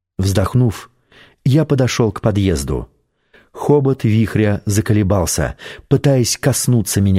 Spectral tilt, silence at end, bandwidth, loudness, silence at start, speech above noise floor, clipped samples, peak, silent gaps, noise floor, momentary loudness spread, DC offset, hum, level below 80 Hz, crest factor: -6 dB/octave; 0 s; 16 kHz; -16 LUFS; 0.2 s; 38 dB; under 0.1%; -2 dBFS; none; -53 dBFS; 8 LU; under 0.1%; none; -36 dBFS; 14 dB